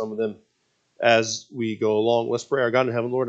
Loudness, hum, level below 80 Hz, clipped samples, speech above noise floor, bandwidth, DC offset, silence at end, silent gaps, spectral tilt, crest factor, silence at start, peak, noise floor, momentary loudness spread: -23 LUFS; none; -74 dBFS; under 0.1%; 47 dB; 8.4 kHz; under 0.1%; 0 s; none; -4.5 dB/octave; 20 dB; 0 s; -4 dBFS; -69 dBFS; 9 LU